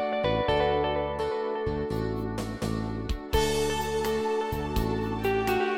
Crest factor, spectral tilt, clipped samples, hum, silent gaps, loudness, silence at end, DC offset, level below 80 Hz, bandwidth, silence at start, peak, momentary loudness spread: 16 dB; -5.5 dB/octave; under 0.1%; none; none; -28 LUFS; 0 s; under 0.1%; -38 dBFS; 17 kHz; 0 s; -12 dBFS; 7 LU